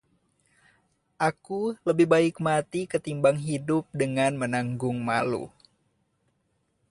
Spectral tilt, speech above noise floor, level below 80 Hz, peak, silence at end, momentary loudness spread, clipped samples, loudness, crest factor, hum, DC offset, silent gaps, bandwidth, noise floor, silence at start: -6 dB/octave; 47 dB; -64 dBFS; -8 dBFS; 1.4 s; 9 LU; under 0.1%; -26 LUFS; 20 dB; none; under 0.1%; none; 11.5 kHz; -73 dBFS; 1.2 s